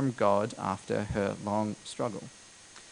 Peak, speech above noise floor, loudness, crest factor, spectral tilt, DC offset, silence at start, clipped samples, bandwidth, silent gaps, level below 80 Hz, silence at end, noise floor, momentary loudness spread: -12 dBFS; 21 dB; -31 LUFS; 20 dB; -6 dB/octave; under 0.1%; 0 s; under 0.1%; 10.5 kHz; none; -56 dBFS; 0 s; -52 dBFS; 22 LU